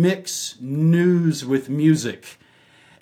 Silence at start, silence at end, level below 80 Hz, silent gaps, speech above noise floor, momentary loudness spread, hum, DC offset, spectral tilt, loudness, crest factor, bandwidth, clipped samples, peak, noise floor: 0 s; 0.7 s; -72 dBFS; none; 34 dB; 10 LU; none; under 0.1%; -6 dB/octave; -20 LUFS; 16 dB; 15.5 kHz; under 0.1%; -6 dBFS; -53 dBFS